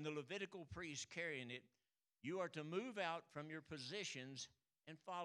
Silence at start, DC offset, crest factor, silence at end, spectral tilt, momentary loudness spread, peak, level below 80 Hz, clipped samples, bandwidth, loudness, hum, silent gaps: 0 s; under 0.1%; 22 dB; 0 s; -4 dB/octave; 9 LU; -28 dBFS; -82 dBFS; under 0.1%; 12 kHz; -49 LUFS; none; none